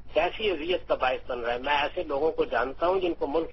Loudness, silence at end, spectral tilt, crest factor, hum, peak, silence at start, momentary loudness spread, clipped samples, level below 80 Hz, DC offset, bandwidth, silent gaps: -28 LUFS; 0 s; -6 dB/octave; 16 dB; none; -10 dBFS; 0 s; 3 LU; under 0.1%; -48 dBFS; under 0.1%; 6 kHz; none